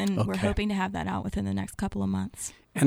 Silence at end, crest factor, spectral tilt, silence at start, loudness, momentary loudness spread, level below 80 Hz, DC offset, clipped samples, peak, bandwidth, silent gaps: 0 s; 18 dB; -6 dB/octave; 0 s; -30 LUFS; 7 LU; -44 dBFS; under 0.1%; under 0.1%; -10 dBFS; 15.5 kHz; none